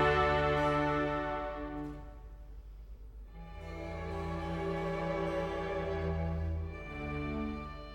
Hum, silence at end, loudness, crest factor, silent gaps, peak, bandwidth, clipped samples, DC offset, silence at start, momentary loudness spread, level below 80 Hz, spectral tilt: none; 0 s; -35 LUFS; 18 dB; none; -18 dBFS; 17 kHz; under 0.1%; under 0.1%; 0 s; 22 LU; -44 dBFS; -7 dB/octave